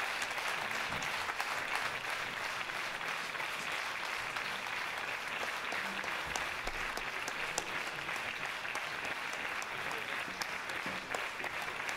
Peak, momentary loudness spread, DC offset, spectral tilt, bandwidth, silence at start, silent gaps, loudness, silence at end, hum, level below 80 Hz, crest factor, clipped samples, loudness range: -12 dBFS; 2 LU; under 0.1%; -1.5 dB/octave; 16 kHz; 0 s; none; -37 LUFS; 0 s; none; -62 dBFS; 28 dB; under 0.1%; 1 LU